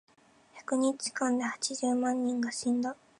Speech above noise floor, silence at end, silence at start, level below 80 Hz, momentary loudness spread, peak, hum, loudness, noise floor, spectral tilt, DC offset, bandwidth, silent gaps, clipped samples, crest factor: 29 dB; 0.25 s; 0.55 s; -82 dBFS; 3 LU; -18 dBFS; none; -31 LUFS; -59 dBFS; -2.5 dB/octave; under 0.1%; 11.5 kHz; none; under 0.1%; 14 dB